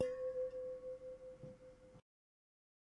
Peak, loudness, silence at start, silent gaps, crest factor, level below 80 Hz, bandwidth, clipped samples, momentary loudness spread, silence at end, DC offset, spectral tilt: -24 dBFS; -47 LUFS; 0 s; none; 24 dB; -74 dBFS; 11 kHz; under 0.1%; 21 LU; 1 s; under 0.1%; -6 dB/octave